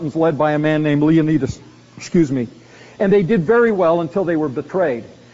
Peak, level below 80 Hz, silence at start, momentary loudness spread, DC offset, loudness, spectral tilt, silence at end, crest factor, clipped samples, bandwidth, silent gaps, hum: -4 dBFS; -48 dBFS; 0 s; 10 LU; under 0.1%; -17 LUFS; -7 dB/octave; 0.25 s; 14 dB; under 0.1%; 7.8 kHz; none; none